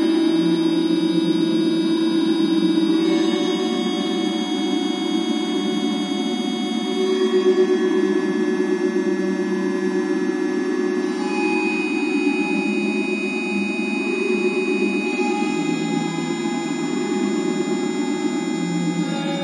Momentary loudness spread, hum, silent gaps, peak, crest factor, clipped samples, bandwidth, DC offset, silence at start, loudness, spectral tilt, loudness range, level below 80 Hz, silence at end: 5 LU; none; none; -6 dBFS; 14 dB; under 0.1%; 11.5 kHz; under 0.1%; 0 s; -21 LUFS; -5 dB/octave; 3 LU; -74 dBFS; 0 s